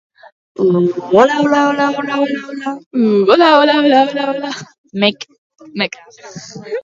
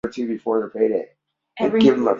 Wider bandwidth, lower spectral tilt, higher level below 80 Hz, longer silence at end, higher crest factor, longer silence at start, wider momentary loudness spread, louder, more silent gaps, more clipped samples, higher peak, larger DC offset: about the same, 7.6 kHz vs 7.4 kHz; about the same, -5.5 dB/octave vs -6.5 dB/octave; second, -64 dBFS vs -58 dBFS; about the same, 0.05 s vs 0 s; about the same, 14 dB vs 18 dB; first, 0.6 s vs 0.05 s; first, 21 LU vs 11 LU; first, -13 LUFS vs -20 LUFS; first, 2.86-2.91 s, 4.78-4.84 s, 5.38-5.50 s vs none; neither; about the same, 0 dBFS vs -2 dBFS; neither